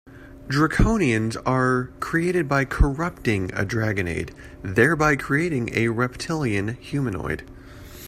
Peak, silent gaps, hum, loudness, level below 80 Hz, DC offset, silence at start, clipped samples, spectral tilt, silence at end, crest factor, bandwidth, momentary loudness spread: -4 dBFS; none; none; -23 LUFS; -32 dBFS; under 0.1%; 0.05 s; under 0.1%; -6.5 dB/octave; 0 s; 20 dB; 14.5 kHz; 10 LU